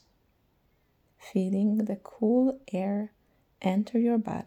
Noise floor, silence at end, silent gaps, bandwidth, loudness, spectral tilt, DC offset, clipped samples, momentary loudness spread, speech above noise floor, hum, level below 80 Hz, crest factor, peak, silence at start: -69 dBFS; 0 s; none; 8.8 kHz; -28 LUFS; -8.5 dB/octave; under 0.1%; under 0.1%; 8 LU; 42 dB; none; -70 dBFS; 16 dB; -14 dBFS; 1.2 s